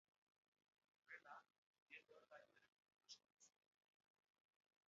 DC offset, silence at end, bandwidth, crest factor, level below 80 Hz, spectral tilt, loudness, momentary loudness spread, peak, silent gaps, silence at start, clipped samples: under 0.1%; 1.4 s; 7 kHz; 24 dB; under -90 dBFS; 2 dB/octave; -65 LUFS; 7 LU; -46 dBFS; 1.58-1.74 s, 1.82-1.86 s, 2.72-2.77 s, 3.32-3.37 s; 1.05 s; under 0.1%